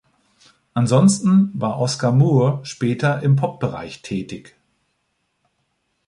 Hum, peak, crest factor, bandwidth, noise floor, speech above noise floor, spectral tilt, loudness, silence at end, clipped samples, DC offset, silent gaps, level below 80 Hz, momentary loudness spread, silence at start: none; -4 dBFS; 16 dB; 11.5 kHz; -71 dBFS; 53 dB; -6.5 dB/octave; -19 LUFS; 1.7 s; under 0.1%; under 0.1%; none; -56 dBFS; 13 LU; 0.75 s